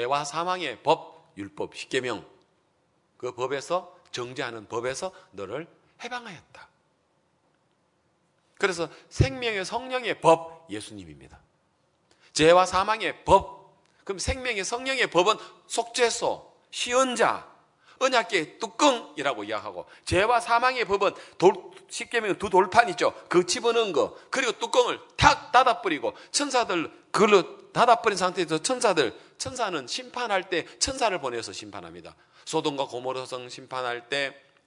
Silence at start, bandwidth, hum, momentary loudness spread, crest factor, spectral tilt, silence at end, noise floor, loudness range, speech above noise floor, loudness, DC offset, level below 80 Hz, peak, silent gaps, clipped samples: 0 s; 11 kHz; none; 17 LU; 24 dB; -3.5 dB/octave; 0.35 s; -69 dBFS; 10 LU; 44 dB; -25 LUFS; under 0.1%; -50 dBFS; -2 dBFS; none; under 0.1%